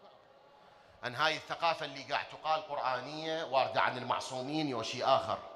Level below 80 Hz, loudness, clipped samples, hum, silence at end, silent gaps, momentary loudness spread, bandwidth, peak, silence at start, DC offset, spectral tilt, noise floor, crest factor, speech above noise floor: -74 dBFS; -34 LUFS; under 0.1%; none; 0 s; none; 7 LU; 12.5 kHz; -12 dBFS; 0.05 s; under 0.1%; -4 dB/octave; -60 dBFS; 22 dB; 26 dB